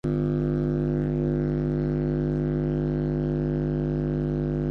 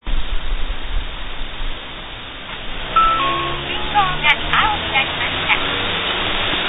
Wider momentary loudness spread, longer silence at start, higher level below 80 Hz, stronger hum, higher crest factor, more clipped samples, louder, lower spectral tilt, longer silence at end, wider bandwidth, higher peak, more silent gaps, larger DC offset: second, 1 LU vs 15 LU; about the same, 0.05 s vs 0.05 s; second, -36 dBFS vs -28 dBFS; first, 50 Hz at -30 dBFS vs none; second, 12 dB vs 18 dB; neither; second, -26 LUFS vs -18 LUFS; first, -11 dB/octave vs -6 dB/octave; about the same, 0 s vs 0 s; first, 5.4 kHz vs 4 kHz; second, -14 dBFS vs 0 dBFS; neither; neither